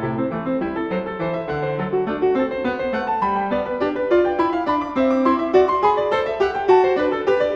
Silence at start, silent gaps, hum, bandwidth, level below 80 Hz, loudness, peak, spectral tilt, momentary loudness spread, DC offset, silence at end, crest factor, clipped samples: 0 s; none; none; 7 kHz; -48 dBFS; -20 LUFS; -4 dBFS; -7.5 dB/octave; 8 LU; under 0.1%; 0 s; 16 dB; under 0.1%